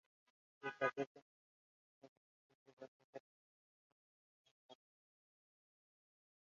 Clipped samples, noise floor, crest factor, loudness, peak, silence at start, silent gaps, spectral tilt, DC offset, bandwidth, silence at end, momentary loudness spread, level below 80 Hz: under 0.1%; under -90 dBFS; 30 dB; -45 LUFS; -24 dBFS; 0.6 s; 1.07-1.15 s, 1.22-2.02 s, 2.08-2.66 s, 2.73-2.77 s, 2.88-3.13 s, 3.20-4.45 s, 4.51-4.69 s; -3 dB/octave; under 0.1%; 7.2 kHz; 1.85 s; 26 LU; under -90 dBFS